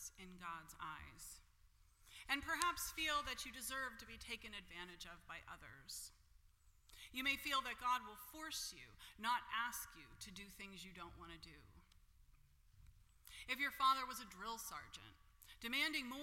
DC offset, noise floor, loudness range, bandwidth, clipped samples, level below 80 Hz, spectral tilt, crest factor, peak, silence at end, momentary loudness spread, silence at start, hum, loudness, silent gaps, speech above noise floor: under 0.1%; -71 dBFS; 10 LU; 16.5 kHz; under 0.1%; -68 dBFS; -1 dB/octave; 32 dB; -16 dBFS; 0 s; 18 LU; 0 s; none; -44 LUFS; none; 25 dB